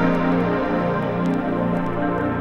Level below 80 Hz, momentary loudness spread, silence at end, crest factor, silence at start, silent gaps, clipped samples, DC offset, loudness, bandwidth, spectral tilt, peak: -40 dBFS; 3 LU; 0 s; 12 dB; 0 s; none; under 0.1%; under 0.1%; -21 LUFS; 6.6 kHz; -9 dB/octave; -8 dBFS